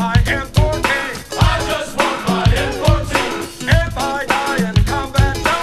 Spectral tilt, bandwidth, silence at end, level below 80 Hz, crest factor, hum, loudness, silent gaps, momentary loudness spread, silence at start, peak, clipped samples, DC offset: -5 dB/octave; 15 kHz; 0 s; -22 dBFS; 16 dB; none; -17 LUFS; none; 4 LU; 0 s; 0 dBFS; under 0.1%; under 0.1%